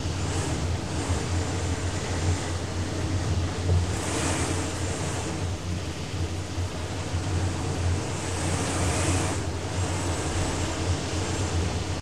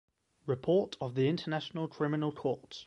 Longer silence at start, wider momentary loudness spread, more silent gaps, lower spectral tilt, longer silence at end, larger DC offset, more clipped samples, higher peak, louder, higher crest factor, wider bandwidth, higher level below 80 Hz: second, 0 s vs 0.45 s; about the same, 5 LU vs 7 LU; neither; second, -4.5 dB/octave vs -7.5 dB/octave; about the same, 0 s vs 0 s; first, 0.8% vs under 0.1%; neither; first, -12 dBFS vs -18 dBFS; first, -28 LUFS vs -33 LUFS; about the same, 16 dB vs 16 dB; first, 13 kHz vs 9.4 kHz; first, -38 dBFS vs -70 dBFS